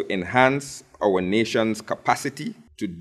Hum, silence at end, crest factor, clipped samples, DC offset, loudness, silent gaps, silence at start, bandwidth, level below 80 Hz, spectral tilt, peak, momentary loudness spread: none; 0 s; 22 dB; under 0.1%; under 0.1%; -23 LUFS; none; 0 s; 15 kHz; -58 dBFS; -5 dB/octave; -2 dBFS; 15 LU